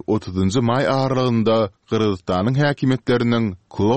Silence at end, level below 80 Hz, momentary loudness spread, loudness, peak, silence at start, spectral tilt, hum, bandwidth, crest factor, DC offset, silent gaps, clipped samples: 0 s; -50 dBFS; 4 LU; -19 LUFS; -6 dBFS; 0.1 s; -7 dB/octave; none; 8.8 kHz; 14 dB; 0.3%; none; under 0.1%